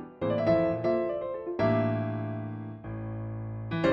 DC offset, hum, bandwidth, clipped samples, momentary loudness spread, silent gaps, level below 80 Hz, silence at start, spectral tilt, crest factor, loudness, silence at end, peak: under 0.1%; none; 7.2 kHz; under 0.1%; 12 LU; none; -56 dBFS; 0 s; -9 dB/octave; 16 dB; -30 LUFS; 0 s; -14 dBFS